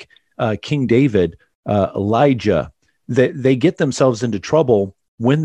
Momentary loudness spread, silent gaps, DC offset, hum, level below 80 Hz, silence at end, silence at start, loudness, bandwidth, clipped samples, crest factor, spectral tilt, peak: 7 LU; 1.55-1.63 s, 5.08-5.18 s; under 0.1%; none; -50 dBFS; 0 s; 0 s; -17 LUFS; 10.5 kHz; under 0.1%; 16 dB; -7 dB/octave; 0 dBFS